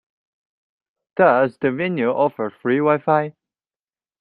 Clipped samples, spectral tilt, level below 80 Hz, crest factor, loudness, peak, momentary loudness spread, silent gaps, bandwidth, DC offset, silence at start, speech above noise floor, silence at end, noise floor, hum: under 0.1%; -9.5 dB/octave; -66 dBFS; 18 dB; -19 LUFS; -2 dBFS; 8 LU; none; 5 kHz; under 0.1%; 1.15 s; over 72 dB; 0.9 s; under -90 dBFS; none